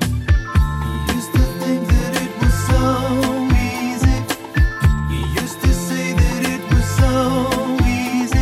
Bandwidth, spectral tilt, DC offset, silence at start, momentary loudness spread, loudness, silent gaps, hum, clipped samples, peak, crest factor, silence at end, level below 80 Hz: 16 kHz; -6 dB/octave; under 0.1%; 0 s; 5 LU; -18 LUFS; none; none; under 0.1%; -4 dBFS; 12 dB; 0 s; -22 dBFS